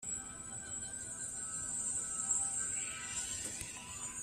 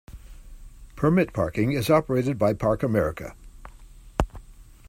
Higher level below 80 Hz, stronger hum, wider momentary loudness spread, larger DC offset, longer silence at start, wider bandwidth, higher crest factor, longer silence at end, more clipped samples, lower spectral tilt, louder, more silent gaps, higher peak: second, -64 dBFS vs -40 dBFS; neither; about the same, 10 LU vs 11 LU; neither; about the same, 0 s vs 0.1 s; about the same, 15.5 kHz vs 16 kHz; about the same, 18 dB vs 20 dB; second, 0 s vs 0.25 s; neither; second, -0.5 dB/octave vs -7 dB/octave; second, -38 LUFS vs -24 LUFS; neither; second, -22 dBFS vs -4 dBFS